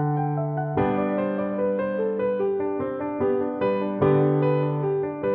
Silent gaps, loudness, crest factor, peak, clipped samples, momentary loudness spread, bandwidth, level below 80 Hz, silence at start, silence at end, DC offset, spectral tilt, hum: none; -24 LUFS; 14 dB; -8 dBFS; under 0.1%; 5 LU; 4.3 kHz; -56 dBFS; 0 s; 0 s; under 0.1%; -12 dB/octave; none